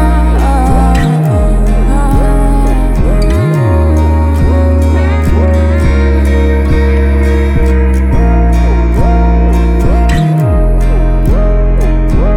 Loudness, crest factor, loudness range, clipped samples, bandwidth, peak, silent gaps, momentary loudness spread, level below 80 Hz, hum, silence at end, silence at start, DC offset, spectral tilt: -10 LUFS; 8 dB; 1 LU; under 0.1%; 12 kHz; 0 dBFS; none; 2 LU; -8 dBFS; none; 0 s; 0 s; under 0.1%; -8 dB/octave